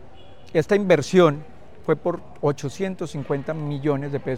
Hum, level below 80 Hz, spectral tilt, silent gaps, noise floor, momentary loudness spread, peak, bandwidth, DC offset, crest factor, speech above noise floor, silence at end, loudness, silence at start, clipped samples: none; -56 dBFS; -6.5 dB/octave; none; -47 dBFS; 11 LU; -4 dBFS; 13 kHz; 1%; 20 dB; 25 dB; 0 s; -23 LUFS; 0.55 s; under 0.1%